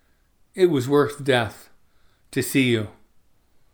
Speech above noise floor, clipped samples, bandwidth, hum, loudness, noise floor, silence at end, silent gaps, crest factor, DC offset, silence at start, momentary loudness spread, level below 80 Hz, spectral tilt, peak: 40 dB; under 0.1%; over 20 kHz; none; -22 LUFS; -61 dBFS; 0.85 s; none; 20 dB; under 0.1%; 0.55 s; 11 LU; -60 dBFS; -5.5 dB/octave; -4 dBFS